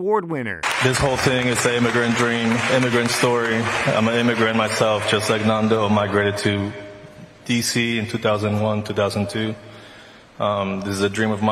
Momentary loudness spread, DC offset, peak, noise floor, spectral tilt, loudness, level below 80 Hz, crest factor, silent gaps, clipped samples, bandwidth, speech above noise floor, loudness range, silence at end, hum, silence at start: 6 LU; under 0.1%; -2 dBFS; -44 dBFS; -4.5 dB/octave; -20 LUFS; -48 dBFS; 18 dB; none; under 0.1%; 15 kHz; 25 dB; 4 LU; 0 s; none; 0 s